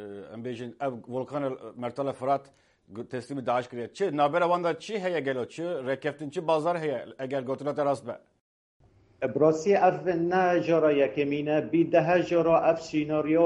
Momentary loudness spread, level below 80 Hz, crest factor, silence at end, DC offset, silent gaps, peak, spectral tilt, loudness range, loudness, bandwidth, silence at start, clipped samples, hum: 13 LU; -68 dBFS; 18 dB; 0 s; under 0.1%; 8.41-8.80 s; -10 dBFS; -6.5 dB/octave; 8 LU; -27 LUFS; 11 kHz; 0 s; under 0.1%; none